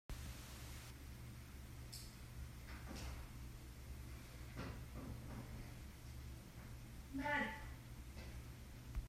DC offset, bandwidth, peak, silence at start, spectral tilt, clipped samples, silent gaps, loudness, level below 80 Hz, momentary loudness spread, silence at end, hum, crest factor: under 0.1%; 16 kHz; -28 dBFS; 0.1 s; -5 dB/octave; under 0.1%; none; -51 LUFS; -56 dBFS; 9 LU; 0 s; none; 22 dB